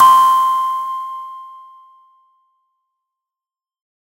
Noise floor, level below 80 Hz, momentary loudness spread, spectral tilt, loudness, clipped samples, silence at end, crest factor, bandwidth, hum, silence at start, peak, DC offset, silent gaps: under -90 dBFS; -84 dBFS; 24 LU; 0 dB/octave; -14 LUFS; under 0.1%; 2.55 s; 18 dB; 16.5 kHz; none; 0 s; 0 dBFS; under 0.1%; none